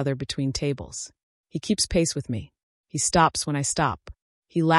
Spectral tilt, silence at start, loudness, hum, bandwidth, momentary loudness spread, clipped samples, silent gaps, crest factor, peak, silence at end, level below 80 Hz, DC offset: -4 dB/octave; 0 s; -25 LUFS; none; 13.5 kHz; 15 LU; under 0.1%; 1.23-1.44 s, 2.63-2.84 s, 4.22-4.42 s; 18 dB; -6 dBFS; 0 s; -46 dBFS; under 0.1%